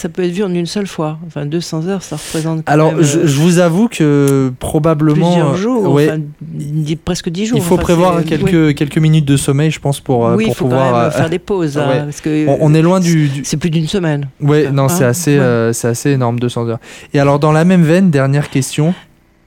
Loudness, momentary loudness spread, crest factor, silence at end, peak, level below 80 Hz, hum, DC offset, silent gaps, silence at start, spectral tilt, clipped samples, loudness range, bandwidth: -13 LUFS; 9 LU; 12 dB; 0.45 s; 0 dBFS; -40 dBFS; none; under 0.1%; none; 0 s; -6.5 dB/octave; under 0.1%; 2 LU; 16.5 kHz